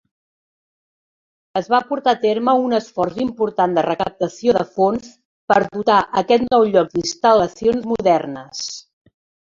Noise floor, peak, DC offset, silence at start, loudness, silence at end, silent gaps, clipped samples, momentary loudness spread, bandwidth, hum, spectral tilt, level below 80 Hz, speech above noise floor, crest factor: under -90 dBFS; -2 dBFS; under 0.1%; 1.55 s; -18 LUFS; 0.75 s; 5.25-5.48 s; under 0.1%; 11 LU; 7.6 kHz; none; -5 dB/octave; -54 dBFS; over 73 dB; 18 dB